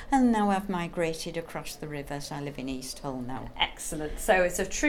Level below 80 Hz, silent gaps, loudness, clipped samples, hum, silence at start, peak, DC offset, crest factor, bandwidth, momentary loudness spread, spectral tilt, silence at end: -44 dBFS; none; -30 LUFS; under 0.1%; none; 0 s; -10 dBFS; under 0.1%; 20 dB; 18.5 kHz; 13 LU; -4 dB/octave; 0 s